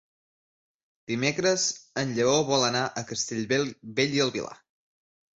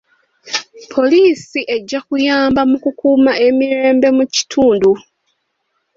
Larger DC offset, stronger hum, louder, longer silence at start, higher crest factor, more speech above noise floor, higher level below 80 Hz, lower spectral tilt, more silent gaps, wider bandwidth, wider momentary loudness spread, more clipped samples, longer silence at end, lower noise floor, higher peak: neither; neither; second, -26 LUFS vs -14 LUFS; first, 1.1 s vs 0.45 s; first, 20 dB vs 12 dB; first, over 63 dB vs 56 dB; second, -66 dBFS vs -52 dBFS; about the same, -3.5 dB/octave vs -3.5 dB/octave; neither; about the same, 8.2 kHz vs 7.6 kHz; about the same, 8 LU vs 10 LU; neither; second, 0.85 s vs 1 s; first, under -90 dBFS vs -68 dBFS; second, -8 dBFS vs -2 dBFS